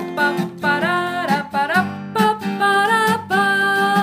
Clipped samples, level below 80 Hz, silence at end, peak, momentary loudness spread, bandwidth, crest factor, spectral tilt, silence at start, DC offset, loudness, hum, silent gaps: under 0.1%; -66 dBFS; 0 s; -4 dBFS; 5 LU; 16 kHz; 14 dB; -4.5 dB/octave; 0 s; under 0.1%; -18 LUFS; none; none